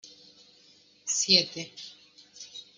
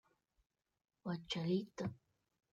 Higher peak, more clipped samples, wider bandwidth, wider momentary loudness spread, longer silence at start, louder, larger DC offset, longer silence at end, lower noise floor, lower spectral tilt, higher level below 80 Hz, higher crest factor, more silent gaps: first, -6 dBFS vs -26 dBFS; neither; first, 12 kHz vs 9 kHz; first, 24 LU vs 8 LU; second, 0.05 s vs 1.05 s; first, -24 LUFS vs -42 LUFS; neither; second, 0.15 s vs 0.55 s; second, -60 dBFS vs -83 dBFS; second, -1 dB/octave vs -6.5 dB/octave; about the same, -76 dBFS vs -76 dBFS; first, 26 dB vs 18 dB; neither